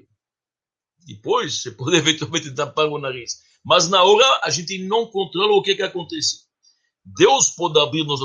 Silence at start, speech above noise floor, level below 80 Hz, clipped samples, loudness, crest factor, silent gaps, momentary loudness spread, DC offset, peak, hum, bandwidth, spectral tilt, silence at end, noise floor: 1.05 s; over 71 dB; -66 dBFS; under 0.1%; -18 LUFS; 20 dB; none; 13 LU; under 0.1%; 0 dBFS; none; 10 kHz; -2.5 dB/octave; 0 s; under -90 dBFS